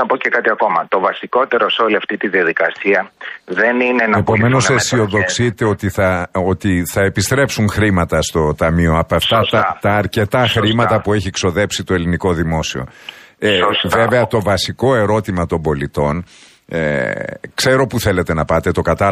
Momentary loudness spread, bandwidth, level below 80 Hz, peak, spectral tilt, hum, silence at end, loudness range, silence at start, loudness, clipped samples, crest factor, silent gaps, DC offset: 6 LU; 15 kHz; -36 dBFS; 0 dBFS; -5 dB/octave; none; 0 s; 3 LU; 0 s; -15 LUFS; under 0.1%; 14 dB; none; under 0.1%